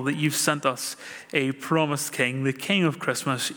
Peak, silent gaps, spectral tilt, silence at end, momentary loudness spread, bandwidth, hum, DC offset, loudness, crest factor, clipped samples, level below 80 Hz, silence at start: -6 dBFS; none; -4 dB/octave; 0 s; 5 LU; over 20 kHz; none; under 0.1%; -25 LUFS; 20 dB; under 0.1%; -74 dBFS; 0 s